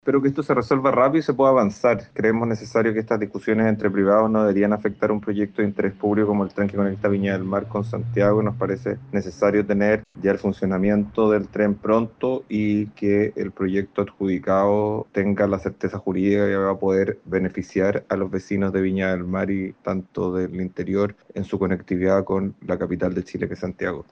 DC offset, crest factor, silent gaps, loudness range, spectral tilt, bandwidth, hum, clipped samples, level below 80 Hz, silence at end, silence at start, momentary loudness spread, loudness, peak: under 0.1%; 16 dB; none; 4 LU; -8.5 dB/octave; 7 kHz; none; under 0.1%; -54 dBFS; 0.1 s; 0.05 s; 8 LU; -22 LUFS; -6 dBFS